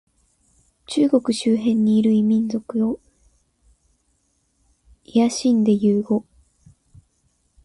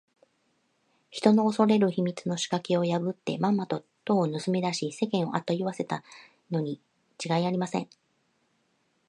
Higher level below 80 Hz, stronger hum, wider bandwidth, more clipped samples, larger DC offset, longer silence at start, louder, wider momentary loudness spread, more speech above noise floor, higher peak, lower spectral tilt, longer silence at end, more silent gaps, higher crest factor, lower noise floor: first, -60 dBFS vs -76 dBFS; neither; about the same, 11.5 kHz vs 11 kHz; neither; neither; second, 0.9 s vs 1.1 s; first, -19 LUFS vs -28 LUFS; second, 8 LU vs 12 LU; first, 49 dB vs 45 dB; about the same, -6 dBFS vs -6 dBFS; about the same, -6.5 dB/octave vs -6 dB/octave; first, 1.45 s vs 1.25 s; neither; second, 16 dB vs 22 dB; second, -67 dBFS vs -72 dBFS